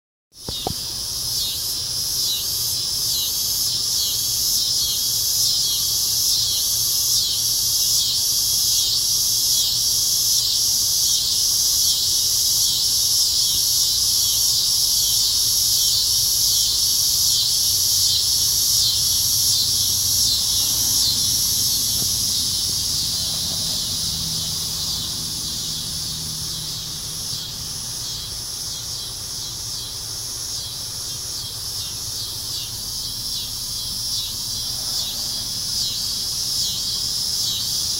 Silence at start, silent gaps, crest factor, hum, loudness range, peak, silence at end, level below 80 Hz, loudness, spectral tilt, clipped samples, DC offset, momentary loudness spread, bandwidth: 0.35 s; none; 16 dB; none; 10 LU; -4 dBFS; 0 s; -44 dBFS; -18 LUFS; 0.5 dB/octave; under 0.1%; under 0.1%; 10 LU; 16 kHz